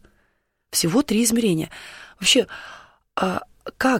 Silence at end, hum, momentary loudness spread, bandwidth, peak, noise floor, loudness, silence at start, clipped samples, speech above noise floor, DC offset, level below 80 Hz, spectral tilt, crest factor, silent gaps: 0 s; none; 21 LU; 16.5 kHz; -6 dBFS; -69 dBFS; -21 LUFS; 0.7 s; under 0.1%; 48 dB; under 0.1%; -54 dBFS; -3 dB/octave; 18 dB; none